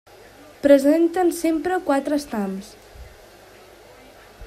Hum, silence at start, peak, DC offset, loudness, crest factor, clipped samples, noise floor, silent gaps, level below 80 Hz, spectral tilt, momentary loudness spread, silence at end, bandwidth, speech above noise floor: none; 0.65 s; -2 dBFS; under 0.1%; -20 LUFS; 20 dB; under 0.1%; -47 dBFS; none; -52 dBFS; -5.5 dB/octave; 14 LU; 0 s; 15.5 kHz; 28 dB